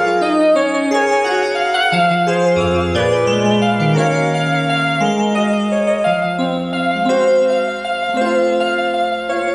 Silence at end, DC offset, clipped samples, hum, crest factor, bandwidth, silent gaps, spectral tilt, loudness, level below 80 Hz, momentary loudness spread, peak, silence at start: 0 s; under 0.1%; under 0.1%; none; 12 dB; 12 kHz; none; -5.5 dB/octave; -16 LUFS; -46 dBFS; 5 LU; -4 dBFS; 0 s